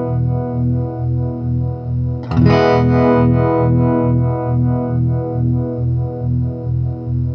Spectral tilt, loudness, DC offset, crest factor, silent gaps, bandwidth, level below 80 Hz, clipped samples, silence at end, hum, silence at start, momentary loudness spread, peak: -10 dB/octave; -16 LUFS; under 0.1%; 14 dB; none; 5.8 kHz; -32 dBFS; under 0.1%; 0 s; 50 Hz at -50 dBFS; 0 s; 8 LU; 0 dBFS